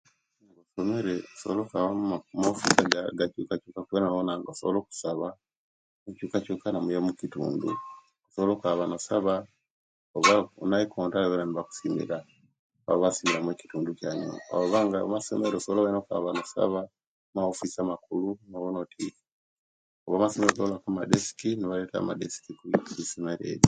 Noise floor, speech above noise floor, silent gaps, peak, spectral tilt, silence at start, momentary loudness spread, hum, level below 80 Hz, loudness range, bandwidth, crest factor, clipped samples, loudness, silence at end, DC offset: -64 dBFS; 36 dB; 5.57-6.06 s, 9.70-10.14 s, 12.59-12.70 s, 17.06-17.33 s, 19.32-20.06 s; 0 dBFS; -4.5 dB/octave; 0.75 s; 10 LU; none; -66 dBFS; 5 LU; 9.6 kHz; 28 dB; under 0.1%; -29 LUFS; 0 s; under 0.1%